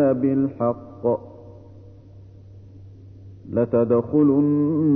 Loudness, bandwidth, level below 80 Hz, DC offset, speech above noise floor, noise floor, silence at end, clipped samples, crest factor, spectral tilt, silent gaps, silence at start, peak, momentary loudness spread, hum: -21 LUFS; 2.8 kHz; -56 dBFS; under 0.1%; 25 dB; -44 dBFS; 0 s; under 0.1%; 14 dB; -13 dB/octave; none; 0 s; -8 dBFS; 10 LU; none